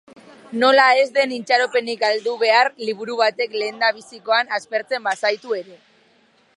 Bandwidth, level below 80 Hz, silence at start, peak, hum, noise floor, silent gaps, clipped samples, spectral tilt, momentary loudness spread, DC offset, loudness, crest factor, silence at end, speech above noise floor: 11.5 kHz; -80 dBFS; 0.5 s; -2 dBFS; none; -58 dBFS; none; under 0.1%; -2.5 dB/octave; 11 LU; under 0.1%; -19 LUFS; 18 dB; 0.8 s; 39 dB